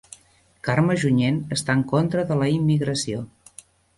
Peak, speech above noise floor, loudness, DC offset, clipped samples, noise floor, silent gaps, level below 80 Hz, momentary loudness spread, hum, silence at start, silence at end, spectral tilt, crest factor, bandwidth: -6 dBFS; 36 dB; -22 LUFS; under 0.1%; under 0.1%; -57 dBFS; none; -54 dBFS; 9 LU; none; 0.65 s; 0.7 s; -6 dB/octave; 16 dB; 11.5 kHz